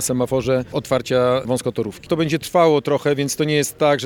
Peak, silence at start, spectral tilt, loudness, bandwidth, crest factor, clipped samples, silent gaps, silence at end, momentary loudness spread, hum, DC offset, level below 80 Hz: -4 dBFS; 0 s; -5 dB/octave; -19 LUFS; 18.5 kHz; 16 dB; under 0.1%; none; 0 s; 6 LU; none; under 0.1%; -50 dBFS